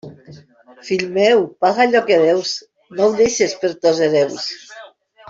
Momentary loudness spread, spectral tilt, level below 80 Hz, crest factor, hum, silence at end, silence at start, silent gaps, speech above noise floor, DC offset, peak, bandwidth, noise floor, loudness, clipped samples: 12 LU; -3.5 dB/octave; -60 dBFS; 14 dB; none; 0.45 s; 0.05 s; none; 28 dB; under 0.1%; -2 dBFS; 7.8 kHz; -44 dBFS; -16 LUFS; under 0.1%